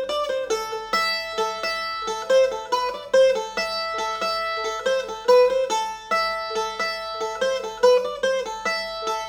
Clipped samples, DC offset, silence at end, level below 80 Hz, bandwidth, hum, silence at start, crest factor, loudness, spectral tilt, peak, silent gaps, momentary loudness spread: under 0.1%; under 0.1%; 0 s; -56 dBFS; 17.5 kHz; none; 0 s; 18 dB; -23 LUFS; -1 dB/octave; -6 dBFS; none; 8 LU